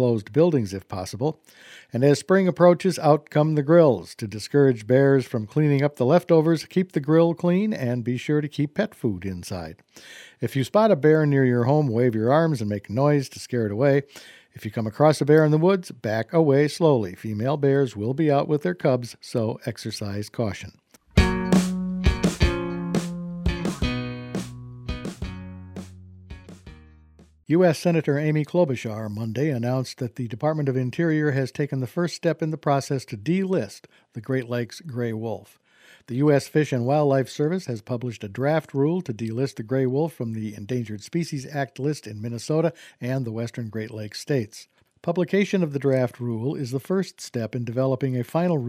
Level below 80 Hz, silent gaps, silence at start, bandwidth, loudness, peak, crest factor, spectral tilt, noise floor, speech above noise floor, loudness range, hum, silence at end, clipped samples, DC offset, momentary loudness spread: -42 dBFS; none; 0 s; 15.5 kHz; -23 LUFS; -2 dBFS; 20 dB; -7 dB/octave; -54 dBFS; 31 dB; 8 LU; none; 0 s; under 0.1%; under 0.1%; 14 LU